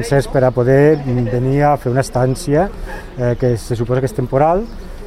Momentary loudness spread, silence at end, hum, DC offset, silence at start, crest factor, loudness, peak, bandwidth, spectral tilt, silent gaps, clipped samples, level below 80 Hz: 8 LU; 0 s; none; under 0.1%; 0 s; 14 dB; -15 LUFS; 0 dBFS; 14 kHz; -7.5 dB/octave; none; under 0.1%; -30 dBFS